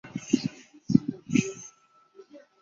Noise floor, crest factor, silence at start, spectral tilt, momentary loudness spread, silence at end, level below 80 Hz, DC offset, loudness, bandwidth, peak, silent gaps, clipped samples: -60 dBFS; 26 dB; 0.05 s; -5.5 dB/octave; 20 LU; 0.25 s; -60 dBFS; under 0.1%; -28 LUFS; 7.8 kHz; -4 dBFS; none; under 0.1%